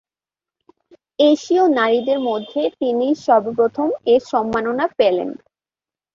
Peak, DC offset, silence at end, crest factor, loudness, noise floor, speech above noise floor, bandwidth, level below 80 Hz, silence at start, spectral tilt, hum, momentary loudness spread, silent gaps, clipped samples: -2 dBFS; under 0.1%; 0.8 s; 16 dB; -18 LUFS; under -90 dBFS; over 73 dB; 7.4 kHz; -60 dBFS; 1.2 s; -5 dB/octave; none; 7 LU; none; under 0.1%